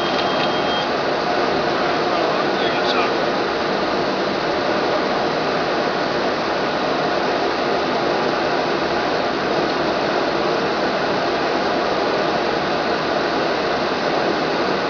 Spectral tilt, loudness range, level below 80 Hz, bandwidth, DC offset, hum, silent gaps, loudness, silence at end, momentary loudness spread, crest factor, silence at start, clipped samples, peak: -4.5 dB/octave; 1 LU; -50 dBFS; 5.4 kHz; under 0.1%; none; none; -19 LUFS; 0 s; 1 LU; 16 dB; 0 s; under 0.1%; -4 dBFS